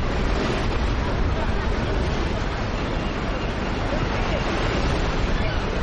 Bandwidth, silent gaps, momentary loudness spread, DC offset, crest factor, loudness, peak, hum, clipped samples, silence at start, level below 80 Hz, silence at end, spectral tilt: 8.8 kHz; none; 3 LU; under 0.1%; 14 dB; -25 LUFS; -10 dBFS; none; under 0.1%; 0 s; -26 dBFS; 0 s; -6 dB/octave